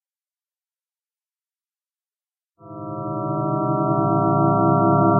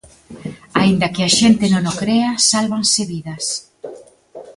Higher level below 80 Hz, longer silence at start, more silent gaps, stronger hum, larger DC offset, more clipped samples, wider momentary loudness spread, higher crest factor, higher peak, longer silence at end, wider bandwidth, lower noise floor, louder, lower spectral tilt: second, -60 dBFS vs -50 dBFS; first, 2.65 s vs 0.3 s; neither; neither; neither; neither; second, 15 LU vs 20 LU; about the same, 18 dB vs 18 dB; second, -4 dBFS vs 0 dBFS; about the same, 0 s vs 0.05 s; second, 1.5 kHz vs 11.5 kHz; first, under -90 dBFS vs -39 dBFS; second, -20 LUFS vs -16 LUFS; first, -9.5 dB/octave vs -3.5 dB/octave